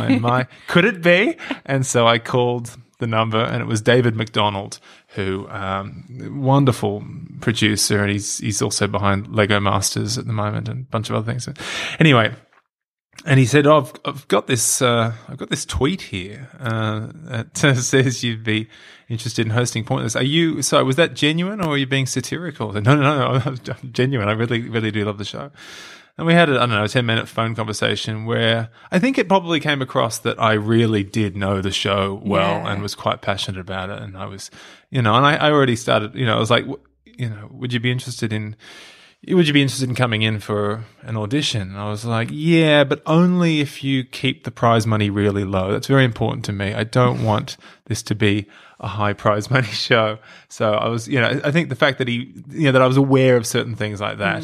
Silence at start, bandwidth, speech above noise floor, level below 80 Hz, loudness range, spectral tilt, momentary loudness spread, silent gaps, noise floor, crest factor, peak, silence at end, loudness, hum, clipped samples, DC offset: 0 s; 15 kHz; 61 dB; -52 dBFS; 4 LU; -5 dB/octave; 14 LU; 12.88-12.97 s, 13.05-13.09 s; -80 dBFS; 18 dB; -2 dBFS; 0 s; -19 LUFS; none; under 0.1%; under 0.1%